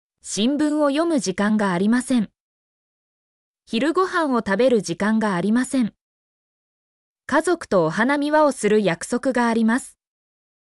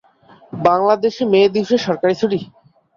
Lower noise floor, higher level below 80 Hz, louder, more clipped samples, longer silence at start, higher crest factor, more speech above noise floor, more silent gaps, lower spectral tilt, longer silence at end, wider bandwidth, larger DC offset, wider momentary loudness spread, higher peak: first, under -90 dBFS vs -48 dBFS; about the same, -60 dBFS vs -58 dBFS; second, -20 LUFS vs -16 LUFS; neither; second, 0.25 s vs 0.55 s; about the same, 14 dB vs 16 dB; first, over 70 dB vs 33 dB; first, 2.40-3.54 s, 6.01-7.16 s vs none; about the same, -5 dB/octave vs -6 dB/octave; first, 0.9 s vs 0.5 s; first, 12 kHz vs 7.2 kHz; neither; about the same, 5 LU vs 6 LU; second, -6 dBFS vs -2 dBFS